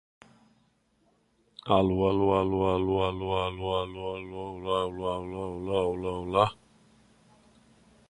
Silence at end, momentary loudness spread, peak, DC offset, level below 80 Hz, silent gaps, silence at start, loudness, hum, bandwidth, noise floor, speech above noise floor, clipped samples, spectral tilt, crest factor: 1.55 s; 11 LU; -6 dBFS; under 0.1%; -50 dBFS; none; 1.65 s; -29 LUFS; none; 10.5 kHz; -69 dBFS; 41 dB; under 0.1%; -7.5 dB/octave; 24 dB